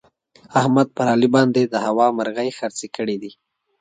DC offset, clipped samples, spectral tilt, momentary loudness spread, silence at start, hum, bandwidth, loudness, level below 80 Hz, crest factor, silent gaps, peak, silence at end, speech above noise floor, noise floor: under 0.1%; under 0.1%; -6 dB/octave; 12 LU; 0.5 s; none; 9.4 kHz; -19 LUFS; -64 dBFS; 18 dB; none; -2 dBFS; 0.5 s; 33 dB; -52 dBFS